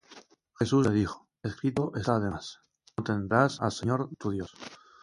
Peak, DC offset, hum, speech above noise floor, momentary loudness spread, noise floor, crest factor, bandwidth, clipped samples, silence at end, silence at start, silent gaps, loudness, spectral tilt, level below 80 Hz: -8 dBFS; under 0.1%; none; 27 dB; 16 LU; -55 dBFS; 22 dB; 11.5 kHz; under 0.1%; 0.25 s; 0.1 s; none; -29 LUFS; -6.5 dB/octave; -54 dBFS